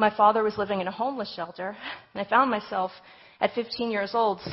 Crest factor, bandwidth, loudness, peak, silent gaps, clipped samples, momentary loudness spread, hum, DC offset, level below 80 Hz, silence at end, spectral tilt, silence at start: 20 dB; 6 kHz; -27 LUFS; -6 dBFS; none; under 0.1%; 13 LU; none; under 0.1%; -64 dBFS; 0 s; -8.5 dB/octave; 0 s